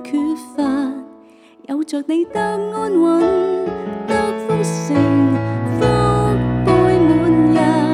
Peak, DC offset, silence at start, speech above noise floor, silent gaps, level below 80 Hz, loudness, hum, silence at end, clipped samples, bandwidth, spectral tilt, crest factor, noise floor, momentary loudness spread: -4 dBFS; under 0.1%; 0 s; 28 dB; none; -38 dBFS; -17 LUFS; none; 0 s; under 0.1%; 11.5 kHz; -7 dB/octave; 12 dB; -45 dBFS; 9 LU